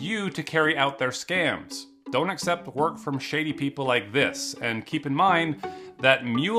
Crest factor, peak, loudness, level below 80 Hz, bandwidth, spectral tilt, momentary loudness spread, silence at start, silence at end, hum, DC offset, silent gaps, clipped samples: 22 dB; -2 dBFS; -25 LUFS; -68 dBFS; 15.5 kHz; -4.5 dB/octave; 8 LU; 0 s; 0 s; none; under 0.1%; none; under 0.1%